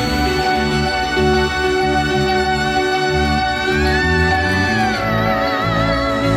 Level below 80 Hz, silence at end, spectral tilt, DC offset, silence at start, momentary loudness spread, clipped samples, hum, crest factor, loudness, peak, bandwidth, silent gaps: -28 dBFS; 0 s; -5 dB/octave; under 0.1%; 0 s; 2 LU; under 0.1%; none; 12 dB; -16 LUFS; -4 dBFS; 16 kHz; none